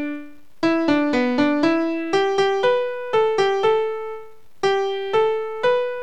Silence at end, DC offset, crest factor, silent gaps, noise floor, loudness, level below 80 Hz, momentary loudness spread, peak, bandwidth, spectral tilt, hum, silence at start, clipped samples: 0 s; 1%; 14 dB; none; -40 dBFS; -20 LUFS; -60 dBFS; 7 LU; -6 dBFS; 9.8 kHz; -5 dB/octave; none; 0 s; under 0.1%